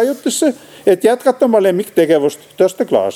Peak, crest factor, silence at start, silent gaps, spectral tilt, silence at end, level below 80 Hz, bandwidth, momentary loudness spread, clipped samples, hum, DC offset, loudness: 0 dBFS; 14 dB; 0 s; none; -4.5 dB/octave; 0 s; -64 dBFS; 18.5 kHz; 4 LU; under 0.1%; none; under 0.1%; -14 LUFS